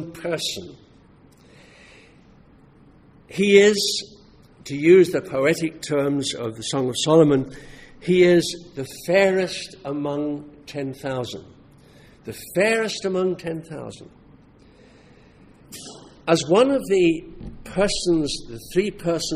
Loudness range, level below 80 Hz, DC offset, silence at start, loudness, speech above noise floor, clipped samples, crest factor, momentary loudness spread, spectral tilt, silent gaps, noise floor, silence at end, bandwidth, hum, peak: 10 LU; -50 dBFS; under 0.1%; 0 s; -21 LUFS; 31 dB; under 0.1%; 20 dB; 21 LU; -4.5 dB/octave; none; -52 dBFS; 0 s; 15.5 kHz; none; -2 dBFS